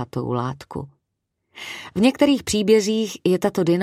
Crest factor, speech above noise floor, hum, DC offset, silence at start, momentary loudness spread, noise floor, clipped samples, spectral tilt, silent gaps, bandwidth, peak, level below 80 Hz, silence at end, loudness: 16 dB; 57 dB; none; under 0.1%; 0 s; 17 LU; -77 dBFS; under 0.1%; -5.5 dB/octave; none; 15.5 kHz; -4 dBFS; -52 dBFS; 0 s; -20 LUFS